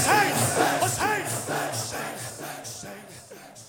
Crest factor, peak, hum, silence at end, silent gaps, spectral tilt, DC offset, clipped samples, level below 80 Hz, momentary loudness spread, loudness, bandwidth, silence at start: 20 dB; -6 dBFS; none; 0 s; none; -3 dB/octave; under 0.1%; under 0.1%; -60 dBFS; 20 LU; -25 LUFS; 17.5 kHz; 0 s